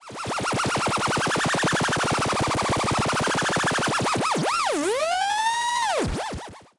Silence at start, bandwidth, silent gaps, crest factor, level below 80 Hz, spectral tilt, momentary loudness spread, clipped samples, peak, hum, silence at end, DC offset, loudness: 0 s; 11.5 kHz; none; 12 dB; -46 dBFS; -3.5 dB/octave; 4 LU; under 0.1%; -14 dBFS; none; 0.15 s; under 0.1%; -23 LUFS